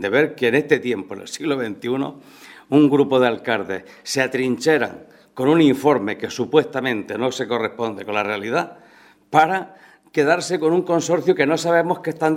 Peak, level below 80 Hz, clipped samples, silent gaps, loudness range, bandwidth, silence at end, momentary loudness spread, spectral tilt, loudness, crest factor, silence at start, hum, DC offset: 0 dBFS; -66 dBFS; under 0.1%; none; 3 LU; 16 kHz; 0 s; 10 LU; -5 dB/octave; -20 LUFS; 20 dB; 0 s; none; under 0.1%